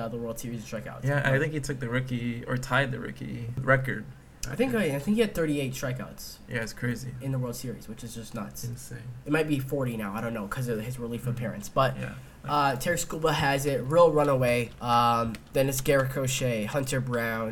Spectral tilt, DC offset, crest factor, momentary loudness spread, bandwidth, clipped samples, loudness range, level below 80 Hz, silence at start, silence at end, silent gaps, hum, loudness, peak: -5.5 dB/octave; under 0.1%; 20 dB; 13 LU; 18.5 kHz; under 0.1%; 8 LU; -50 dBFS; 0 s; 0 s; none; none; -28 LUFS; -8 dBFS